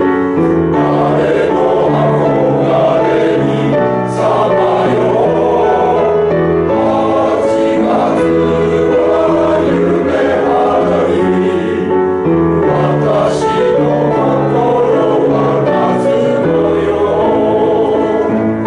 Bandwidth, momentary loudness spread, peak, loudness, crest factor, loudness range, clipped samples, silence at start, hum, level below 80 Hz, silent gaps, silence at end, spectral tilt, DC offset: 11 kHz; 2 LU; -2 dBFS; -12 LUFS; 8 dB; 1 LU; under 0.1%; 0 s; none; -42 dBFS; none; 0 s; -7.5 dB/octave; under 0.1%